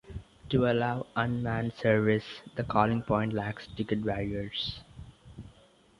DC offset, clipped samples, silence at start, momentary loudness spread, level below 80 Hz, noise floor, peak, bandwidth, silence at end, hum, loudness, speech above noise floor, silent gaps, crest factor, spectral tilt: under 0.1%; under 0.1%; 0.05 s; 22 LU; -52 dBFS; -60 dBFS; -8 dBFS; 11 kHz; 0.5 s; none; -30 LUFS; 31 dB; none; 22 dB; -8 dB/octave